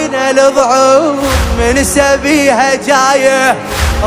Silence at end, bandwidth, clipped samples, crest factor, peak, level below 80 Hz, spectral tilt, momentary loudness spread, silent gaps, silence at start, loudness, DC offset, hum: 0 s; 16.5 kHz; 0.4%; 10 dB; 0 dBFS; -22 dBFS; -4 dB/octave; 4 LU; none; 0 s; -9 LUFS; under 0.1%; none